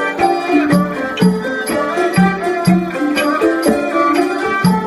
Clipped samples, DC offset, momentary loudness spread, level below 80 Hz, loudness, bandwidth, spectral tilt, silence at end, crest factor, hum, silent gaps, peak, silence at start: under 0.1%; under 0.1%; 4 LU; -46 dBFS; -15 LUFS; 14 kHz; -6 dB/octave; 0 s; 14 dB; none; none; 0 dBFS; 0 s